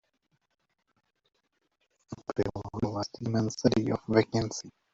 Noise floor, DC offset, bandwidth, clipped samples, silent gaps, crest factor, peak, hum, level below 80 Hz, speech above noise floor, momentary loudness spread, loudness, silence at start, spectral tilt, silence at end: -77 dBFS; under 0.1%; 7.8 kHz; under 0.1%; none; 22 dB; -10 dBFS; none; -58 dBFS; 48 dB; 11 LU; -30 LUFS; 2.1 s; -6 dB/octave; 0.25 s